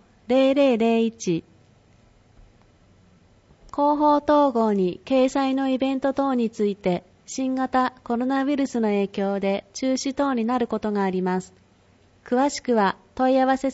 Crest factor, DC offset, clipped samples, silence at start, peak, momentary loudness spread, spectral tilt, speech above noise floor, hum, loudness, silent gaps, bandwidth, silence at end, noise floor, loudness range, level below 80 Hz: 14 dB; under 0.1%; under 0.1%; 0.3 s; -8 dBFS; 8 LU; -5.5 dB/octave; 35 dB; none; -23 LUFS; none; 8 kHz; 0 s; -57 dBFS; 4 LU; -58 dBFS